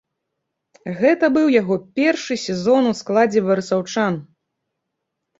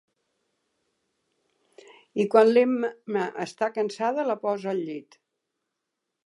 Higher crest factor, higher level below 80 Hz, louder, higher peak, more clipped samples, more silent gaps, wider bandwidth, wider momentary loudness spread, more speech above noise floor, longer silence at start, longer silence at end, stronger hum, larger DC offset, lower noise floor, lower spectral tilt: about the same, 18 dB vs 22 dB; first, -62 dBFS vs -82 dBFS; first, -18 LUFS vs -25 LUFS; about the same, -2 dBFS vs -4 dBFS; neither; neither; second, 8 kHz vs 11.5 kHz; second, 7 LU vs 13 LU; about the same, 60 dB vs 59 dB; second, 0.85 s vs 2.15 s; about the same, 1.15 s vs 1.25 s; neither; neither; second, -78 dBFS vs -83 dBFS; about the same, -5.5 dB/octave vs -6 dB/octave